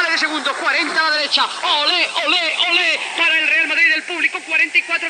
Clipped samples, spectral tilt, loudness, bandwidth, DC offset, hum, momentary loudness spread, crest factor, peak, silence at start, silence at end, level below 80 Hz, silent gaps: under 0.1%; 1 dB/octave; -15 LUFS; 13.5 kHz; under 0.1%; none; 4 LU; 16 dB; -2 dBFS; 0 s; 0 s; under -90 dBFS; none